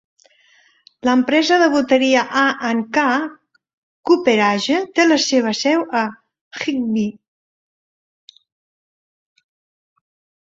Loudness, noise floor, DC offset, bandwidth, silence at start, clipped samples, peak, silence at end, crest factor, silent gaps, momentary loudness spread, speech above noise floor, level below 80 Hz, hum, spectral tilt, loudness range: -17 LUFS; -55 dBFS; under 0.1%; 7.8 kHz; 1.05 s; under 0.1%; -2 dBFS; 3.3 s; 18 dB; 3.73-4.03 s, 6.41-6.51 s; 10 LU; 39 dB; -64 dBFS; none; -3.5 dB/octave; 11 LU